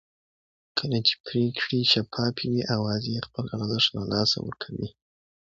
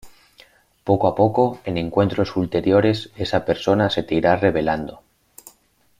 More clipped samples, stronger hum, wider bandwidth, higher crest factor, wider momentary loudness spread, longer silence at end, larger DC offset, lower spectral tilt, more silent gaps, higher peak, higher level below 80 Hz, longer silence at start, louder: neither; neither; second, 7.8 kHz vs 15.5 kHz; about the same, 22 dB vs 18 dB; first, 12 LU vs 7 LU; second, 0.5 s vs 1.05 s; neither; second, -5 dB/octave vs -7 dB/octave; first, 1.20-1.24 s vs none; second, -6 dBFS vs -2 dBFS; second, -58 dBFS vs -48 dBFS; first, 0.75 s vs 0.05 s; second, -26 LUFS vs -20 LUFS